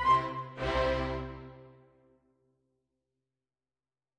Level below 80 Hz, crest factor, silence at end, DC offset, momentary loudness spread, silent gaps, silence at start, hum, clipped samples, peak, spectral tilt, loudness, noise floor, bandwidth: -48 dBFS; 20 dB; 2.45 s; under 0.1%; 18 LU; none; 0 s; none; under 0.1%; -14 dBFS; -6 dB/octave; -32 LUFS; under -90 dBFS; 10 kHz